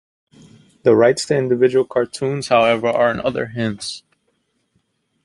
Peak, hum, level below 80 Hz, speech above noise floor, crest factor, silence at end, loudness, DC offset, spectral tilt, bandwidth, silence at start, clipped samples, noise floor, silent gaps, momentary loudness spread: 0 dBFS; none; -56 dBFS; 51 dB; 18 dB; 1.25 s; -17 LUFS; under 0.1%; -5 dB/octave; 11.5 kHz; 0.85 s; under 0.1%; -67 dBFS; none; 9 LU